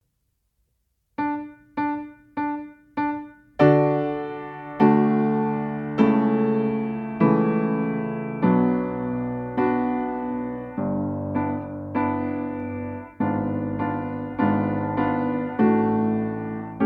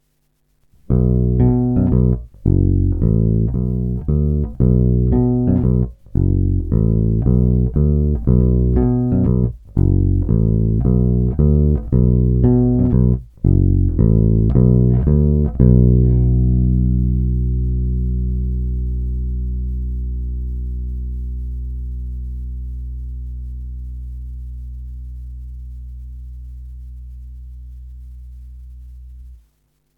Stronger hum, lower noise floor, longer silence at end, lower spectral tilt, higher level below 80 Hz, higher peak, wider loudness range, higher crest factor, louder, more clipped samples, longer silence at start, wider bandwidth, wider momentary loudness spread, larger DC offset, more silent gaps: neither; first, -73 dBFS vs -63 dBFS; second, 0 s vs 0.65 s; second, -10.5 dB/octave vs -14 dB/octave; second, -56 dBFS vs -22 dBFS; second, -4 dBFS vs 0 dBFS; second, 6 LU vs 19 LU; about the same, 20 dB vs 16 dB; second, -24 LUFS vs -17 LUFS; neither; first, 1.2 s vs 0.9 s; first, 4.9 kHz vs 1.9 kHz; second, 11 LU vs 20 LU; neither; neither